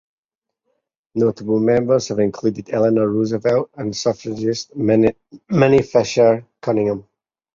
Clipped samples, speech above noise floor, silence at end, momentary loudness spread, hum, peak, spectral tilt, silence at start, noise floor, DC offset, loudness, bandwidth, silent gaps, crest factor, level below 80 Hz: under 0.1%; 66 dB; 0.55 s; 8 LU; none; -2 dBFS; -6.5 dB/octave; 1.15 s; -84 dBFS; under 0.1%; -18 LUFS; 7.6 kHz; none; 16 dB; -52 dBFS